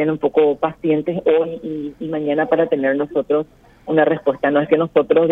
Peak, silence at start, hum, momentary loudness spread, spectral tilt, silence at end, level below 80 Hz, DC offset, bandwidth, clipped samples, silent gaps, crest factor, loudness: -2 dBFS; 0 s; none; 10 LU; -9 dB/octave; 0 s; -56 dBFS; under 0.1%; 3.9 kHz; under 0.1%; none; 16 dB; -18 LUFS